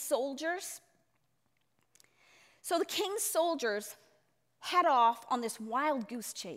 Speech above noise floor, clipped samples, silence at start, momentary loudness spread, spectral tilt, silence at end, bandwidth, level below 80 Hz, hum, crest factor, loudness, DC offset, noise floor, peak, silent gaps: 46 dB; under 0.1%; 0 s; 15 LU; -1.5 dB/octave; 0 s; 16 kHz; -86 dBFS; none; 18 dB; -32 LUFS; under 0.1%; -79 dBFS; -16 dBFS; none